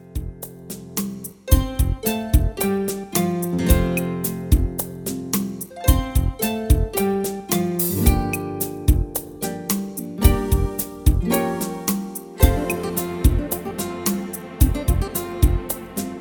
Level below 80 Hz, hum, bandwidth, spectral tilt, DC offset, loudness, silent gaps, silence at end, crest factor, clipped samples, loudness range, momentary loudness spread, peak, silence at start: -24 dBFS; none; over 20 kHz; -5.5 dB/octave; under 0.1%; -22 LUFS; none; 0 s; 20 dB; under 0.1%; 1 LU; 9 LU; 0 dBFS; 0 s